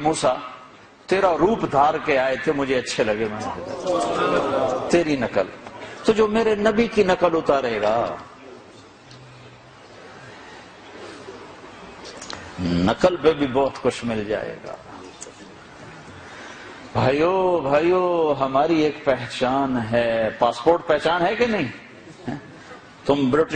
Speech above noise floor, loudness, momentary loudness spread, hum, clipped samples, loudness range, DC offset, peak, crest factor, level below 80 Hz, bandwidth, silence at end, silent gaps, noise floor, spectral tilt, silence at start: 26 dB; -21 LUFS; 22 LU; none; under 0.1%; 11 LU; under 0.1%; -4 dBFS; 18 dB; -50 dBFS; 9.4 kHz; 0 s; none; -46 dBFS; -5.5 dB/octave; 0 s